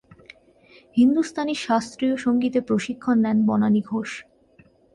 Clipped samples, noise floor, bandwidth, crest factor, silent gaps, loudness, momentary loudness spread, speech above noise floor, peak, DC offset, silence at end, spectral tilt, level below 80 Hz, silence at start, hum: under 0.1%; -56 dBFS; 11 kHz; 14 dB; none; -22 LUFS; 9 LU; 35 dB; -8 dBFS; under 0.1%; 0.7 s; -6 dB/octave; -62 dBFS; 0.95 s; none